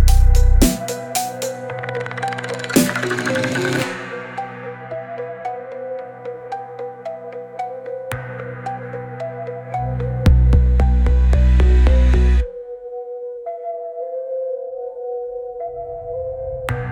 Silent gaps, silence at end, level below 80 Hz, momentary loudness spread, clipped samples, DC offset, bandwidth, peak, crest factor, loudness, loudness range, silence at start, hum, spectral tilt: none; 0 s; -20 dBFS; 15 LU; under 0.1%; under 0.1%; 18 kHz; -2 dBFS; 16 dB; -21 LUFS; 13 LU; 0 s; none; -5.5 dB/octave